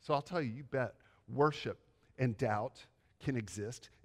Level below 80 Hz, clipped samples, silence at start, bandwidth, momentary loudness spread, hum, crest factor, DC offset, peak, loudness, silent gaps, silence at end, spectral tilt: -70 dBFS; under 0.1%; 0.05 s; 12.5 kHz; 11 LU; none; 20 dB; under 0.1%; -18 dBFS; -38 LUFS; none; 0.2 s; -6.5 dB/octave